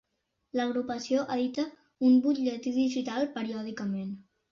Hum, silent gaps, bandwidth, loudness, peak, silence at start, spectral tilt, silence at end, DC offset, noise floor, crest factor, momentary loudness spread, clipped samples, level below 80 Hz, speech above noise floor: none; none; 7.2 kHz; -30 LUFS; -14 dBFS; 0.55 s; -5.5 dB/octave; 0.3 s; under 0.1%; -80 dBFS; 16 dB; 12 LU; under 0.1%; -72 dBFS; 51 dB